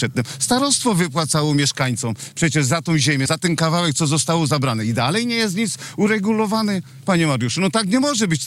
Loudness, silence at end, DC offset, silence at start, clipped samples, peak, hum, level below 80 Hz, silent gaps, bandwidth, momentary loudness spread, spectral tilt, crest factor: -19 LUFS; 0 s; under 0.1%; 0 s; under 0.1%; -8 dBFS; none; -54 dBFS; none; 16 kHz; 5 LU; -4 dB/octave; 12 dB